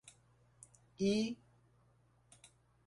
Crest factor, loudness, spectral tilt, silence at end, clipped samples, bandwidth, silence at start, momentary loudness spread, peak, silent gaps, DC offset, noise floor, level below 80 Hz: 20 dB; -37 LUFS; -5.5 dB/octave; 1.55 s; under 0.1%; 11.5 kHz; 0.05 s; 26 LU; -24 dBFS; none; under 0.1%; -71 dBFS; -74 dBFS